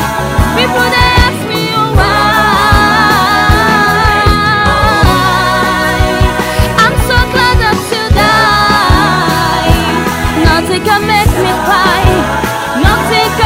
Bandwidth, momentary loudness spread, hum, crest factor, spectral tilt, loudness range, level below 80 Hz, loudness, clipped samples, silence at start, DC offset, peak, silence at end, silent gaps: 16.5 kHz; 4 LU; none; 8 dB; -4.5 dB/octave; 2 LU; -18 dBFS; -9 LUFS; 0.8%; 0 s; under 0.1%; 0 dBFS; 0 s; none